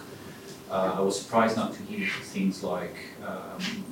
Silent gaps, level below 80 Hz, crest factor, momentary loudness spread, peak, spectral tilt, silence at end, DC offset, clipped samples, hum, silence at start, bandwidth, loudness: none; -70 dBFS; 20 dB; 16 LU; -10 dBFS; -5 dB/octave; 0 s; under 0.1%; under 0.1%; none; 0 s; 17 kHz; -29 LUFS